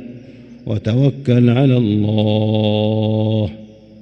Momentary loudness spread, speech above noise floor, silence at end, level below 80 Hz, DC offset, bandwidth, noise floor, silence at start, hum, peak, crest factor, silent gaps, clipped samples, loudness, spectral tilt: 11 LU; 23 dB; 0.35 s; -52 dBFS; under 0.1%; 6.2 kHz; -38 dBFS; 0 s; none; -2 dBFS; 14 dB; none; under 0.1%; -16 LUFS; -9.5 dB/octave